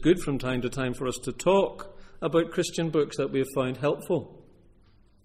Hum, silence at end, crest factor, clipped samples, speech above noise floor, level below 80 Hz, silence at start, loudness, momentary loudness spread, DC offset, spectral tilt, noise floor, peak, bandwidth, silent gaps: none; 0.85 s; 18 dB; under 0.1%; 31 dB; -48 dBFS; 0 s; -28 LUFS; 8 LU; under 0.1%; -5.5 dB/octave; -58 dBFS; -10 dBFS; 15.5 kHz; none